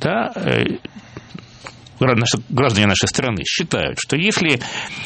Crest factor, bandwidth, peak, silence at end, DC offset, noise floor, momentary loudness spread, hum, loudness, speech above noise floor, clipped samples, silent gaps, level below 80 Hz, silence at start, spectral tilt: 20 dB; 8.8 kHz; 0 dBFS; 0 s; under 0.1%; -39 dBFS; 22 LU; none; -18 LUFS; 20 dB; under 0.1%; none; -46 dBFS; 0 s; -4 dB/octave